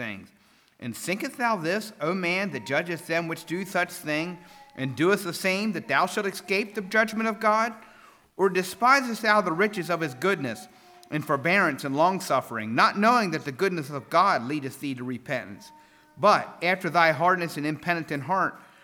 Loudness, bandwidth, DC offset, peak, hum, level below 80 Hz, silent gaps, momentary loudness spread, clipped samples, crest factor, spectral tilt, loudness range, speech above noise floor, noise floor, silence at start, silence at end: -25 LUFS; over 20 kHz; under 0.1%; -6 dBFS; none; -74 dBFS; none; 12 LU; under 0.1%; 20 dB; -4.5 dB/octave; 4 LU; 35 dB; -60 dBFS; 0 s; 0.25 s